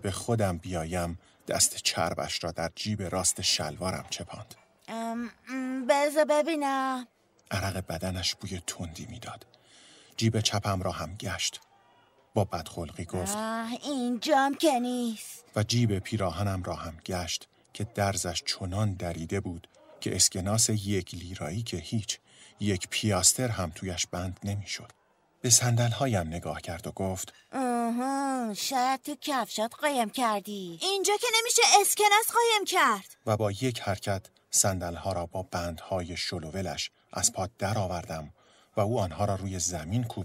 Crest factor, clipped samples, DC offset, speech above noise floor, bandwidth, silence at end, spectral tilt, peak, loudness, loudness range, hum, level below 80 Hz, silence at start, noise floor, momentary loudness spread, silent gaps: 24 dB; under 0.1%; under 0.1%; 33 dB; 16 kHz; 0 s; -3.5 dB/octave; -6 dBFS; -29 LUFS; 8 LU; none; -56 dBFS; 0 s; -63 dBFS; 13 LU; none